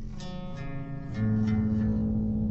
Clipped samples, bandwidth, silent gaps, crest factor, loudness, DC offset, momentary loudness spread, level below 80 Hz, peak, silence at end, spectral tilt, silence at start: under 0.1%; 7.4 kHz; none; 12 dB; -30 LUFS; under 0.1%; 12 LU; -40 dBFS; -18 dBFS; 0 s; -9 dB/octave; 0 s